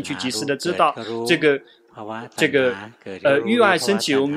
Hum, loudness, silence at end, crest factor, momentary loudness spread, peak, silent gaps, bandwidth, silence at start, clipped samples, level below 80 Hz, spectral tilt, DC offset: none; -19 LUFS; 0 s; 20 dB; 16 LU; 0 dBFS; none; 15.5 kHz; 0 s; under 0.1%; -68 dBFS; -4 dB/octave; under 0.1%